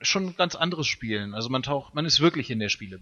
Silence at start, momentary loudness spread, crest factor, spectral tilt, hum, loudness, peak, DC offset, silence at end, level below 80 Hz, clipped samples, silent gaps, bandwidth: 0 s; 9 LU; 18 dB; -3.5 dB/octave; none; -25 LUFS; -8 dBFS; under 0.1%; 0 s; -56 dBFS; under 0.1%; none; 7.4 kHz